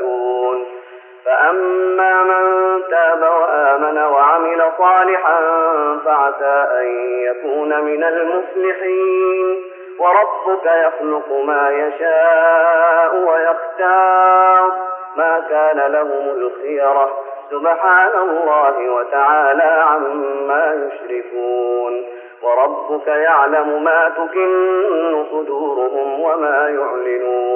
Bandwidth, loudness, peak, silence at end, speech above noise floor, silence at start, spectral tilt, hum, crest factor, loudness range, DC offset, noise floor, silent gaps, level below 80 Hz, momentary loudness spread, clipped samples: 3.4 kHz; -15 LUFS; -2 dBFS; 0 s; 22 dB; 0 s; 1 dB/octave; none; 14 dB; 4 LU; under 0.1%; -37 dBFS; none; under -90 dBFS; 9 LU; under 0.1%